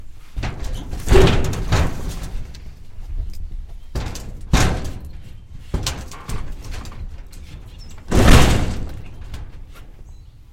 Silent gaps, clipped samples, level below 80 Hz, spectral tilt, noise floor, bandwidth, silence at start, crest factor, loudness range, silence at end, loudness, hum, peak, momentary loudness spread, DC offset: none; under 0.1%; -24 dBFS; -5 dB/octave; -40 dBFS; 16 kHz; 0 s; 20 dB; 7 LU; 0.1 s; -20 LUFS; none; 0 dBFS; 25 LU; under 0.1%